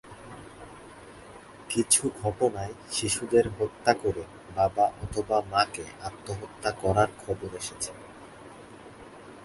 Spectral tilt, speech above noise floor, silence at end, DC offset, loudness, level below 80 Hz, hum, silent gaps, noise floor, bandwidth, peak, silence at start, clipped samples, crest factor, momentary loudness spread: -3.5 dB/octave; 20 dB; 0 s; under 0.1%; -28 LUFS; -52 dBFS; none; none; -48 dBFS; 12 kHz; -6 dBFS; 0.05 s; under 0.1%; 24 dB; 23 LU